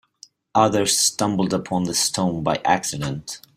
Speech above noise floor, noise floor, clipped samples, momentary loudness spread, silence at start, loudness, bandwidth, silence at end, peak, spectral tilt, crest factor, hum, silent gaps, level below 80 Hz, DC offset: 30 dB; -51 dBFS; under 0.1%; 9 LU; 0.55 s; -20 LUFS; 16 kHz; 0.2 s; -2 dBFS; -3.5 dB/octave; 20 dB; none; none; -54 dBFS; under 0.1%